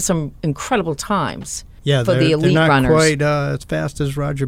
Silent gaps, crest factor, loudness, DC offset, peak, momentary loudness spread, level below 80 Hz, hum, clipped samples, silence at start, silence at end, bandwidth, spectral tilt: none; 14 dB; -17 LUFS; under 0.1%; -4 dBFS; 10 LU; -38 dBFS; none; under 0.1%; 0 s; 0 s; 15.5 kHz; -5 dB/octave